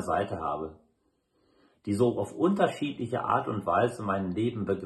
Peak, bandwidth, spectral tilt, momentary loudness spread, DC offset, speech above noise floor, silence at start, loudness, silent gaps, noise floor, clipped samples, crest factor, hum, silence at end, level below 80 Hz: -10 dBFS; 12.5 kHz; -7 dB/octave; 7 LU; under 0.1%; 44 dB; 0 s; -29 LUFS; none; -73 dBFS; under 0.1%; 20 dB; none; 0 s; -64 dBFS